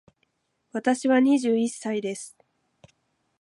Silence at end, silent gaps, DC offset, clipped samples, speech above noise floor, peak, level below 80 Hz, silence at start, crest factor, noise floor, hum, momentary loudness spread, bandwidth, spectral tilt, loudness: 1.1 s; none; under 0.1%; under 0.1%; 50 dB; -10 dBFS; -76 dBFS; 0.75 s; 18 dB; -73 dBFS; none; 16 LU; 11.5 kHz; -4.5 dB/octave; -24 LUFS